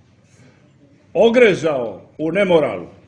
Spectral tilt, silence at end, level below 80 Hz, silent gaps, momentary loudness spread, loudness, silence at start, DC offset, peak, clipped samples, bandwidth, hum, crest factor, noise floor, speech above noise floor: -6 dB/octave; 0.2 s; -56 dBFS; none; 14 LU; -16 LUFS; 1.15 s; under 0.1%; 0 dBFS; under 0.1%; 9.2 kHz; none; 18 dB; -51 dBFS; 35 dB